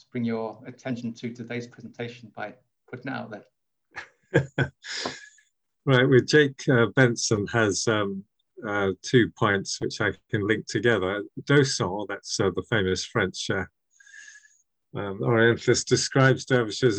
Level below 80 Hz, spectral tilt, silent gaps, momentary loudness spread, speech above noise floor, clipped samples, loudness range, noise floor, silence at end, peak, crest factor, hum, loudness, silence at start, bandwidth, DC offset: -60 dBFS; -5 dB/octave; none; 18 LU; 41 dB; under 0.1%; 11 LU; -66 dBFS; 0 s; -4 dBFS; 20 dB; none; -24 LUFS; 0.15 s; 9.4 kHz; under 0.1%